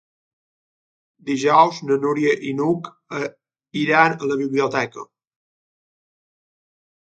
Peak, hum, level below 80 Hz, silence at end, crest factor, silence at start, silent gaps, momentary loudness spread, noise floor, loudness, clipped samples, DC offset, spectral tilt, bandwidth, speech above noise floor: 0 dBFS; none; -70 dBFS; 1.95 s; 22 dB; 1.25 s; none; 15 LU; under -90 dBFS; -20 LUFS; under 0.1%; under 0.1%; -5.5 dB/octave; 9 kHz; over 71 dB